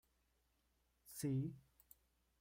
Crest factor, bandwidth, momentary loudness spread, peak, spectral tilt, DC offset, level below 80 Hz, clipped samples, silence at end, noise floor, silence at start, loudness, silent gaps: 16 dB; 16 kHz; 25 LU; -32 dBFS; -6.5 dB/octave; under 0.1%; -76 dBFS; under 0.1%; 0.8 s; -82 dBFS; 1.05 s; -45 LUFS; none